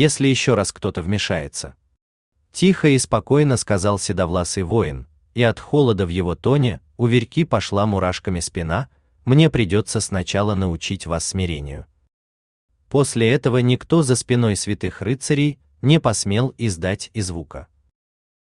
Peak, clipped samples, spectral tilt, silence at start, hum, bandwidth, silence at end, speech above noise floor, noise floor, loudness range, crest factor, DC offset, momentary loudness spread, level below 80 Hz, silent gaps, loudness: -2 dBFS; under 0.1%; -5.5 dB/octave; 0 s; none; 12.5 kHz; 0.85 s; over 71 dB; under -90 dBFS; 3 LU; 16 dB; under 0.1%; 10 LU; -44 dBFS; 2.02-2.32 s, 12.13-12.68 s; -20 LUFS